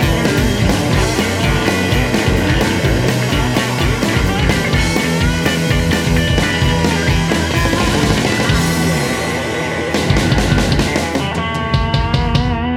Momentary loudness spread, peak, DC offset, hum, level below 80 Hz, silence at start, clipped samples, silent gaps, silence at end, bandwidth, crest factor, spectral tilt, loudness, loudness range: 3 LU; -2 dBFS; under 0.1%; none; -24 dBFS; 0 s; under 0.1%; none; 0 s; 17 kHz; 14 dB; -5 dB/octave; -15 LUFS; 1 LU